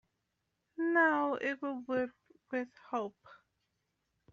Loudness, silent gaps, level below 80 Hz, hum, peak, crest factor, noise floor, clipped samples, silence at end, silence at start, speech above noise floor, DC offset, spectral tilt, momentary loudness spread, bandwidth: -34 LUFS; none; -80 dBFS; none; -16 dBFS; 20 dB; -84 dBFS; under 0.1%; 1 s; 0.8 s; 48 dB; under 0.1%; -2.5 dB/octave; 13 LU; 7.2 kHz